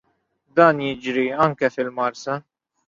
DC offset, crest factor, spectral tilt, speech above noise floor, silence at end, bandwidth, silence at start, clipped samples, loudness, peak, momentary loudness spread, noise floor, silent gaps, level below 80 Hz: under 0.1%; 20 dB; -6 dB/octave; 47 dB; 0.45 s; 7.6 kHz; 0.55 s; under 0.1%; -21 LUFS; -2 dBFS; 12 LU; -67 dBFS; none; -62 dBFS